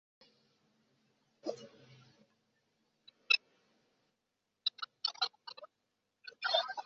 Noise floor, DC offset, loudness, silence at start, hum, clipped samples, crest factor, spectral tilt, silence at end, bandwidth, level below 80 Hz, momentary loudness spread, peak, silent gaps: -85 dBFS; under 0.1%; -35 LUFS; 1.45 s; none; under 0.1%; 28 dB; 2.5 dB/octave; 0.05 s; 7.4 kHz; under -90 dBFS; 23 LU; -14 dBFS; none